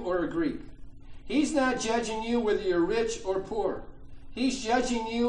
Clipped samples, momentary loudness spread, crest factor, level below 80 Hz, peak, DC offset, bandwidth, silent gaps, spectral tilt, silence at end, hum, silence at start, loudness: under 0.1%; 6 LU; 16 dB; -46 dBFS; -12 dBFS; under 0.1%; 10.5 kHz; none; -4 dB/octave; 0 s; none; 0 s; -29 LUFS